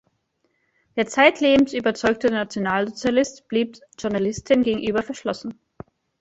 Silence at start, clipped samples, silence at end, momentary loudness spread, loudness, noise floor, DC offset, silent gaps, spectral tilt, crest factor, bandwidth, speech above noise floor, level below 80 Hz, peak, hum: 0.95 s; under 0.1%; 0.7 s; 12 LU; -21 LUFS; -70 dBFS; under 0.1%; none; -4.5 dB/octave; 22 dB; 8 kHz; 49 dB; -54 dBFS; 0 dBFS; none